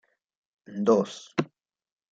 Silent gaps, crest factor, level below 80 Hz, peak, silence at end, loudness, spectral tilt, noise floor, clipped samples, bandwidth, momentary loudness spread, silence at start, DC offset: none; 20 dB; -76 dBFS; -8 dBFS; 0.7 s; -27 LUFS; -6 dB/octave; -60 dBFS; under 0.1%; 7.8 kHz; 16 LU; 0.7 s; under 0.1%